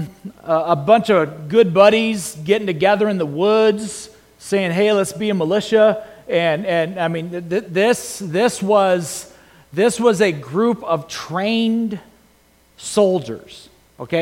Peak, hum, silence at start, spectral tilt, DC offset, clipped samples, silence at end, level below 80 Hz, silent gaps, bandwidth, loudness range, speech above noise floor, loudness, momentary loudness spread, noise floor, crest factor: 0 dBFS; none; 0 s; -5 dB/octave; under 0.1%; under 0.1%; 0 s; -58 dBFS; none; 16.5 kHz; 4 LU; 37 dB; -17 LUFS; 13 LU; -54 dBFS; 18 dB